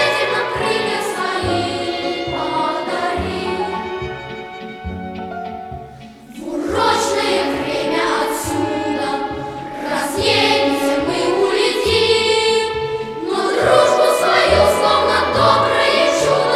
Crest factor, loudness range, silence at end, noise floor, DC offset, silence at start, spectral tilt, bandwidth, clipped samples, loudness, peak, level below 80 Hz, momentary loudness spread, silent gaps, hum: 16 dB; 9 LU; 0 s; -37 dBFS; under 0.1%; 0 s; -3.5 dB/octave; 15.5 kHz; under 0.1%; -17 LUFS; -2 dBFS; -44 dBFS; 15 LU; none; none